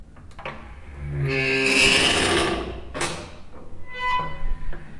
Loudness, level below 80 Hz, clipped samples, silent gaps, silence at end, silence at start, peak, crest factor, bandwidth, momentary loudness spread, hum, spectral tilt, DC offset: -21 LUFS; -34 dBFS; under 0.1%; none; 0 s; 0 s; -6 dBFS; 18 dB; 11.5 kHz; 22 LU; none; -3 dB/octave; under 0.1%